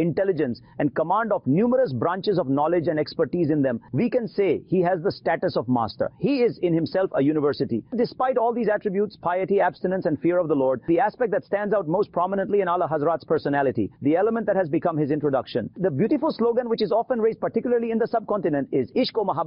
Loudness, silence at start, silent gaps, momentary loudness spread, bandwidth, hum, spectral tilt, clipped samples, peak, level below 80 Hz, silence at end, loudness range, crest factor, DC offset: -23 LUFS; 0 s; none; 4 LU; 5.6 kHz; none; -6 dB/octave; under 0.1%; -12 dBFS; -60 dBFS; 0 s; 1 LU; 12 dB; under 0.1%